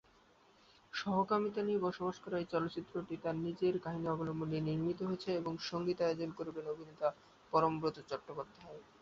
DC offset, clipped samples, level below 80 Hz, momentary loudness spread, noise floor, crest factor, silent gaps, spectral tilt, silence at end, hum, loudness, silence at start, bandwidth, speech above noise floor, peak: under 0.1%; under 0.1%; -70 dBFS; 10 LU; -67 dBFS; 20 dB; none; -5.5 dB/octave; 0.2 s; none; -38 LUFS; 0.95 s; 7.6 kHz; 30 dB; -18 dBFS